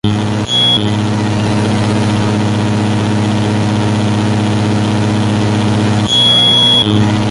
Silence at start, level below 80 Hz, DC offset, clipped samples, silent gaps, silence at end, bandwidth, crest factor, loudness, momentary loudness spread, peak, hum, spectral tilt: 0.05 s; -36 dBFS; under 0.1%; under 0.1%; none; 0 s; 11.5 kHz; 12 dB; -11 LUFS; 7 LU; 0 dBFS; 60 Hz at -20 dBFS; -5.5 dB/octave